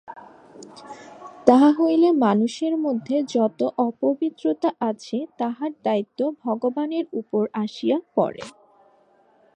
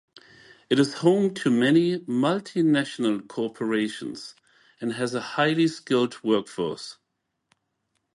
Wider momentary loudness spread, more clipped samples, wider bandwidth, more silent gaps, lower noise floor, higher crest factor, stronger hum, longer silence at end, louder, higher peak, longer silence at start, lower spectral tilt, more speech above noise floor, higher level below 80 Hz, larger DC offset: first, 23 LU vs 13 LU; neither; second, 9.6 kHz vs 11.5 kHz; neither; second, -59 dBFS vs -79 dBFS; about the same, 22 dB vs 18 dB; neither; second, 1.05 s vs 1.25 s; about the same, -22 LUFS vs -24 LUFS; first, 0 dBFS vs -6 dBFS; second, 0.1 s vs 0.7 s; about the same, -6.5 dB/octave vs -5.5 dB/octave; second, 37 dB vs 55 dB; about the same, -70 dBFS vs -72 dBFS; neither